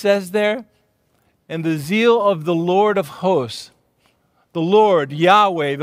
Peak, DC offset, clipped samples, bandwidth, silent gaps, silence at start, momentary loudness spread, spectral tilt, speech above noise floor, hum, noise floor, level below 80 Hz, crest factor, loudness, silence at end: 0 dBFS; under 0.1%; under 0.1%; 16 kHz; none; 0 s; 14 LU; -6 dB/octave; 46 dB; none; -63 dBFS; -68 dBFS; 18 dB; -17 LUFS; 0 s